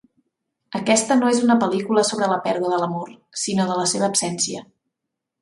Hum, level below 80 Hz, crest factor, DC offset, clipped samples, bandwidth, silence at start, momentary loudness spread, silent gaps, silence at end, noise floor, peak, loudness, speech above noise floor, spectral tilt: none; -66 dBFS; 18 dB; under 0.1%; under 0.1%; 11.5 kHz; 0.7 s; 10 LU; none; 0.8 s; -82 dBFS; -4 dBFS; -20 LUFS; 62 dB; -3.5 dB/octave